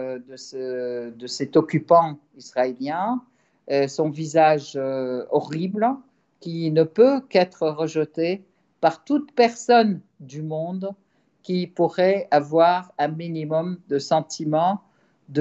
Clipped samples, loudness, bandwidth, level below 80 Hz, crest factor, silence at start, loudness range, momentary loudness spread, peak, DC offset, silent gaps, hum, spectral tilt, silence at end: under 0.1%; -22 LUFS; 8.2 kHz; -74 dBFS; 20 dB; 0 s; 2 LU; 14 LU; -4 dBFS; under 0.1%; none; none; -6 dB/octave; 0 s